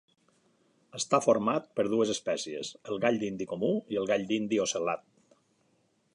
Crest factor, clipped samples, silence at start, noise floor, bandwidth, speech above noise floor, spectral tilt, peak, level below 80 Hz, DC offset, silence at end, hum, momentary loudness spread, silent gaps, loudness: 20 dB; under 0.1%; 0.95 s; -71 dBFS; 11.5 kHz; 42 dB; -4 dB/octave; -12 dBFS; -74 dBFS; under 0.1%; 1.15 s; none; 10 LU; none; -30 LUFS